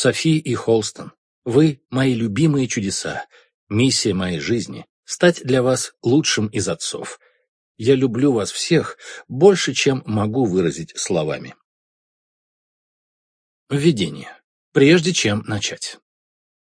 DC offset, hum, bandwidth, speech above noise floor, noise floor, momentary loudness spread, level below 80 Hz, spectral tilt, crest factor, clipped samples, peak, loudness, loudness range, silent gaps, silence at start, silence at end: under 0.1%; none; 10.5 kHz; over 71 dB; under -90 dBFS; 15 LU; -56 dBFS; -5 dB/octave; 20 dB; under 0.1%; 0 dBFS; -19 LUFS; 7 LU; 1.18-1.42 s, 3.54-3.67 s, 4.89-5.03 s, 7.48-7.75 s, 11.64-13.67 s, 14.44-14.72 s; 0 s; 0.85 s